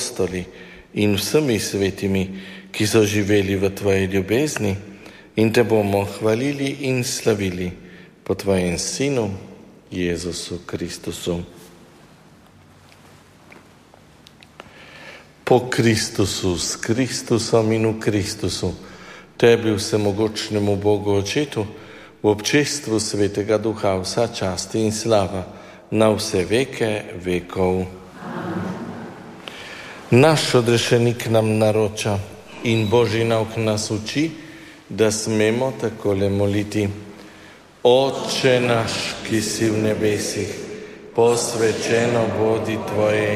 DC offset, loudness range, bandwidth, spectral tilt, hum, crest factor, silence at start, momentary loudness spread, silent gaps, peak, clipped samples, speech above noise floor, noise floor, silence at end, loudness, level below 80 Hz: under 0.1%; 5 LU; 15.5 kHz; -5 dB/octave; none; 18 dB; 0 s; 17 LU; none; -2 dBFS; under 0.1%; 29 dB; -49 dBFS; 0 s; -20 LUFS; -52 dBFS